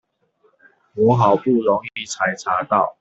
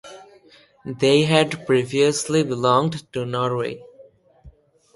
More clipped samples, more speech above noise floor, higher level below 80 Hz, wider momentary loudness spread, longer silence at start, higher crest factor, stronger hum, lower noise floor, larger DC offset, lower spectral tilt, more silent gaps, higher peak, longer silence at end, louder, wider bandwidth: neither; first, 44 dB vs 33 dB; about the same, -60 dBFS vs -58 dBFS; second, 7 LU vs 13 LU; first, 0.95 s vs 0.05 s; about the same, 18 dB vs 18 dB; neither; first, -62 dBFS vs -52 dBFS; neither; about the same, -6 dB/octave vs -5 dB/octave; neither; about the same, -2 dBFS vs -4 dBFS; second, 0.1 s vs 0.45 s; about the same, -19 LUFS vs -20 LUFS; second, 8 kHz vs 11.5 kHz